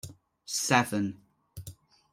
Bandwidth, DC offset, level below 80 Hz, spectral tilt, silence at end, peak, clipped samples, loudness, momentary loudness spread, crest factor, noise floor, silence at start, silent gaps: 16 kHz; under 0.1%; -64 dBFS; -3.5 dB/octave; 0.4 s; -8 dBFS; under 0.1%; -28 LUFS; 25 LU; 24 dB; -50 dBFS; 0.05 s; none